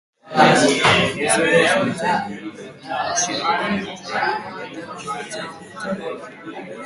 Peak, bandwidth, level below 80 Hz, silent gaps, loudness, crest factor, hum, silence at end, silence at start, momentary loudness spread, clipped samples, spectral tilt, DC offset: 0 dBFS; 11.5 kHz; -54 dBFS; none; -19 LUFS; 20 dB; none; 0 s; 0.25 s; 19 LU; under 0.1%; -3 dB/octave; under 0.1%